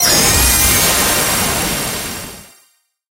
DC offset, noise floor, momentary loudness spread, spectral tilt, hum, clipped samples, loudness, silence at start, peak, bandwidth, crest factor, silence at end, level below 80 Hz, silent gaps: under 0.1%; -56 dBFS; 14 LU; -1.5 dB/octave; none; under 0.1%; -12 LUFS; 0 s; 0 dBFS; 16 kHz; 16 dB; 0.65 s; -28 dBFS; none